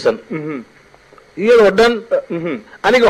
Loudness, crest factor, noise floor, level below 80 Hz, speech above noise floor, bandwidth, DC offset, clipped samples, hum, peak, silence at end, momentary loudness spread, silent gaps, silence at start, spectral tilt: -15 LUFS; 12 dB; -45 dBFS; -48 dBFS; 31 dB; 12 kHz; under 0.1%; under 0.1%; none; -2 dBFS; 0 s; 16 LU; none; 0 s; -5 dB/octave